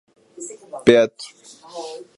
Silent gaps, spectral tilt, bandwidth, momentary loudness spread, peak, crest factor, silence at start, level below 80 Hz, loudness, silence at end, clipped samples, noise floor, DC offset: none; -4.5 dB/octave; 11.5 kHz; 23 LU; 0 dBFS; 22 dB; 0.4 s; -58 dBFS; -17 LUFS; 0.2 s; under 0.1%; -38 dBFS; under 0.1%